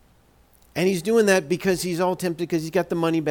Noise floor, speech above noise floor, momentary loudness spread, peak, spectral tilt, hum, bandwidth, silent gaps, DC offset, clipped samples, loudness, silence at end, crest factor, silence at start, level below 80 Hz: -57 dBFS; 35 dB; 7 LU; -8 dBFS; -5 dB/octave; none; 18.5 kHz; none; under 0.1%; under 0.1%; -22 LUFS; 0 s; 16 dB; 0.75 s; -56 dBFS